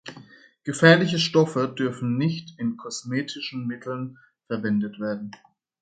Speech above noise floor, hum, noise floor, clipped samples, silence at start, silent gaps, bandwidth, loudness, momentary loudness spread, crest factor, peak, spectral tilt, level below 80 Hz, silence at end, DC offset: 26 dB; none; -50 dBFS; under 0.1%; 0.05 s; none; 9.2 kHz; -24 LUFS; 16 LU; 24 dB; 0 dBFS; -5.5 dB/octave; -66 dBFS; 0.5 s; under 0.1%